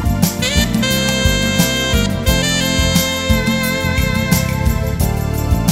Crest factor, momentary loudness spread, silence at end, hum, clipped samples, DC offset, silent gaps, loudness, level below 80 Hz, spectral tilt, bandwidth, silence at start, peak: 16 dB; 4 LU; 0 s; none; under 0.1%; under 0.1%; none; -15 LUFS; -22 dBFS; -4 dB/octave; 16.5 kHz; 0 s; 0 dBFS